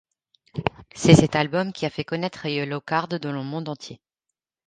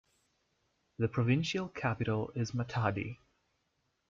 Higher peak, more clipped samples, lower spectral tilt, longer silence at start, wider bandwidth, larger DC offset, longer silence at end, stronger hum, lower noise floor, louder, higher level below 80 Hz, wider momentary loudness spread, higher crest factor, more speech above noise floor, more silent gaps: first, 0 dBFS vs -18 dBFS; neither; about the same, -6 dB/octave vs -6.5 dB/octave; second, 0.55 s vs 1 s; first, 9.6 kHz vs 7.6 kHz; neither; second, 0.75 s vs 0.95 s; neither; first, -85 dBFS vs -80 dBFS; first, -23 LUFS vs -34 LUFS; first, -50 dBFS vs -64 dBFS; first, 16 LU vs 8 LU; first, 24 dB vs 18 dB; first, 62 dB vs 46 dB; neither